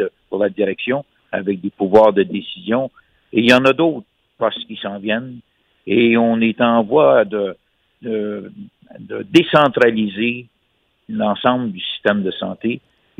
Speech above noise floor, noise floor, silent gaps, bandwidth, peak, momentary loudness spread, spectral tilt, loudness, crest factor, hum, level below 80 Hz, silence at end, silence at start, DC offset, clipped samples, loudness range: 48 dB; -64 dBFS; none; 11 kHz; 0 dBFS; 16 LU; -6.5 dB/octave; -17 LUFS; 18 dB; none; -58 dBFS; 0.4 s; 0 s; under 0.1%; under 0.1%; 2 LU